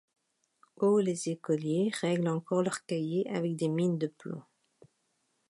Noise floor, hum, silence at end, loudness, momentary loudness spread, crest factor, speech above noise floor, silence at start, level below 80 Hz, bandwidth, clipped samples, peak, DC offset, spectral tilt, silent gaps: -77 dBFS; none; 1.1 s; -31 LUFS; 8 LU; 16 dB; 46 dB; 0.8 s; -80 dBFS; 11.5 kHz; under 0.1%; -16 dBFS; under 0.1%; -6.5 dB/octave; none